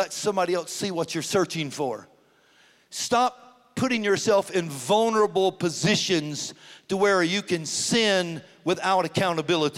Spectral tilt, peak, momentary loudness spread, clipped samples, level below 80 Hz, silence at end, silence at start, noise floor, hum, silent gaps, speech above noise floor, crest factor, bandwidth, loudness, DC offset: -3.5 dB/octave; -10 dBFS; 10 LU; under 0.1%; -68 dBFS; 0 s; 0 s; -59 dBFS; none; none; 35 dB; 16 dB; 16 kHz; -24 LUFS; under 0.1%